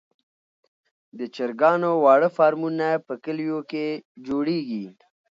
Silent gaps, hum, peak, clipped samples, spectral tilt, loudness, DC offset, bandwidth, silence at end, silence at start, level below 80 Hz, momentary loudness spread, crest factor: 4.05-4.15 s; none; -4 dBFS; under 0.1%; -7.5 dB/octave; -23 LUFS; under 0.1%; 7.4 kHz; 0.5 s; 1.15 s; -72 dBFS; 16 LU; 20 dB